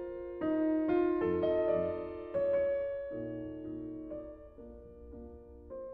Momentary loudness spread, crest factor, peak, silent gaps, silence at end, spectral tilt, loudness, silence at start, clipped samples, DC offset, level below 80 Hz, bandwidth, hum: 21 LU; 16 dB; -20 dBFS; none; 0 s; -7 dB/octave; -34 LUFS; 0 s; under 0.1%; under 0.1%; -58 dBFS; 4.6 kHz; none